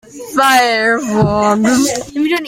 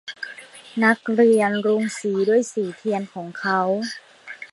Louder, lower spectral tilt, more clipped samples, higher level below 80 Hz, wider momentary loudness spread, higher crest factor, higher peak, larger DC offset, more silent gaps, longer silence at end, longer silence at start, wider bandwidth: first, -13 LUFS vs -21 LUFS; about the same, -4 dB/octave vs -5 dB/octave; neither; first, -42 dBFS vs -74 dBFS; second, 7 LU vs 18 LU; second, 12 dB vs 20 dB; about the same, 0 dBFS vs -2 dBFS; neither; neither; about the same, 0 s vs 0.05 s; about the same, 0.15 s vs 0.05 s; first, 16.5 kHz vs 11.5 kHz